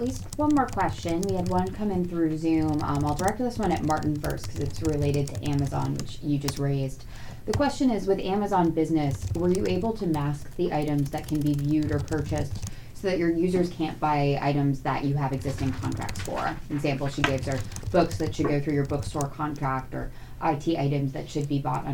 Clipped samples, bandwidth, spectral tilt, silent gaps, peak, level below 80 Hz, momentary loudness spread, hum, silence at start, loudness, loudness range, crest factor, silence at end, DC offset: under 0.1%; 18.5 kHz; -6.5 dB/octave; none; -8 dBFS; -42 dBFS; 7 LU; none; 0 s; -27 LUFS; 2 LU; 18 dB; 0 s; under 0.1%